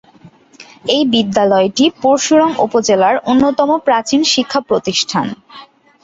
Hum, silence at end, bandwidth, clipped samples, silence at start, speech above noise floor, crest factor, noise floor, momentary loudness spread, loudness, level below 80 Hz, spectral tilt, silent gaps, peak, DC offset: none; 0.4 s; 8 kHz; under 0.1%; 0.25 s; 31 dB; 12 dB; -44 dBFS; 5 LU; -13 LUFS; -52 dBFS; -3.5 dB/octave; none; 0 dBFS; under 0.1%